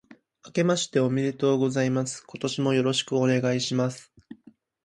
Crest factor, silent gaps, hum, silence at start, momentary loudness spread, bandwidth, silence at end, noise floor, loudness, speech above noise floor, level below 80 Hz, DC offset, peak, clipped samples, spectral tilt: 16 dB; none; none; 0.45 s; 8 LU; 11.5 kHz; 0.5 s; -56 dBFS; -25 LUFS; 32 dB; -68 dBFS; under 0.1%; -10 dBFS; under 0.1%; -5 dB/octave